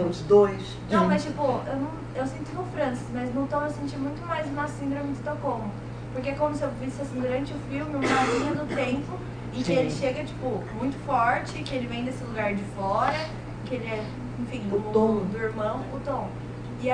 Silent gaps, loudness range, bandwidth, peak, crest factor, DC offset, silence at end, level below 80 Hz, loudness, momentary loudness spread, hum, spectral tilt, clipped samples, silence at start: none; 3 LU; 10 kHz; -8 dBFS; 20 dB; under 0.1%; 0 s; -46 dBFS; -28 LUFS; 10 LU; 60 Hz at -40 dBFS; -6.5 dB/octave; under 0.1%; 0 s